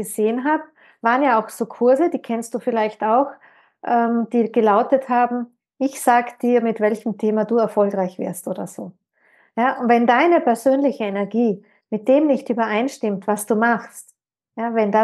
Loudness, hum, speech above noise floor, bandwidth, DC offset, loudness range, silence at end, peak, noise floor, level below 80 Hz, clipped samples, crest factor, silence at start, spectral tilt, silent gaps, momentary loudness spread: -19 LUFS; none; 40 dB; 12.5 kHz; under 0.1%; 3 LU; 0 s; -2 dBFS; -58 dBFS; -84 dBFS; under 0.1%; 18 dB; 0 s; -5.5 dB/octave; none; 12 LU